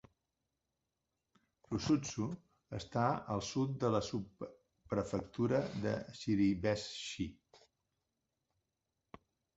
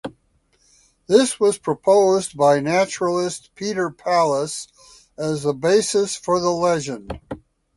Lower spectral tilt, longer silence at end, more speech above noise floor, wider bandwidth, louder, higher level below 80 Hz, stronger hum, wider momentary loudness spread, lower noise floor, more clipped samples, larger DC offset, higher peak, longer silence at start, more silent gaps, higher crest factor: first, -6 dB/octave vs -4.5 dB/octave; first, 2 s vs 0.4 s; first, 52 dB vs 43 dB; second, 8 kHz vs 11.5 kHz; second, -37 LUFS vs -20 LUFS; second, -62 dBFS vs -54 dBFS; neither; second, 12 LU vs 16 LU; first, -88 dBFS vs -63 dBFS; neither; neither; second, -18 dBFS vs -2 dBFS; first, 1.7 s vs 0.05 s; neither; about the same, 22 dB vs 20 dB